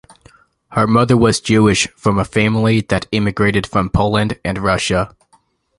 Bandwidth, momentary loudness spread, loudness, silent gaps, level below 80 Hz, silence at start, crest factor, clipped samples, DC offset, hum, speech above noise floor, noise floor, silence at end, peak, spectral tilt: 11.5 kHz; 6 LU; -15 LUFS; none; -36 dBFS; 0.7 s; 16 dB; under 0.1%; under 0.1%; none; 42 dB; -57 dBFS; 0.7 s; 0 dBFS; -5.5 dB/octave